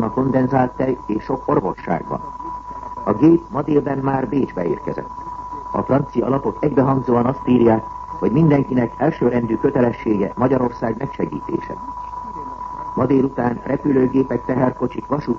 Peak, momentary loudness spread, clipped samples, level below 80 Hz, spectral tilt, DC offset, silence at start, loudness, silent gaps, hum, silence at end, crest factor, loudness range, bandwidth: -2 dBFS; 14 LU; under 0.1%; -44 dBFS; -10 dB/octave; under 0.1%; 0 s; -19 LUFS; none; none; 0 s; 16 dB; 4 LU; 6.8 kHz